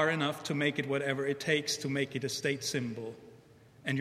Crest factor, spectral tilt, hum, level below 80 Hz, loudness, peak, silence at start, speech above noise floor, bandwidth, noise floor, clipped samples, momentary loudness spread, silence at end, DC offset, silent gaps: 18 dB; -4 dB/octave; none; -74 dBFS; -33 LUFS; -14 dBFS; 0 s; 25 dB; 16 kHz; -58 dBFS; under 0.1%; 10 LU; 0 s; under 0.1%; none